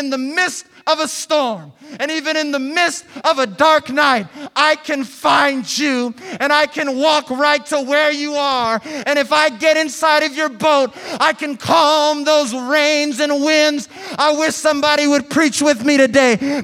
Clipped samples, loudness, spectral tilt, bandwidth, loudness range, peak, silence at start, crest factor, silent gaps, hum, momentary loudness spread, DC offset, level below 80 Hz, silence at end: under 0.1%; -15 LUFS; -2.5 dB/octave; 16 kHz; 2 LU; 0 dBFS; 0 s; 16 dB; none; none; 7 LU; under 0.1%; -62 dBFS; 0 s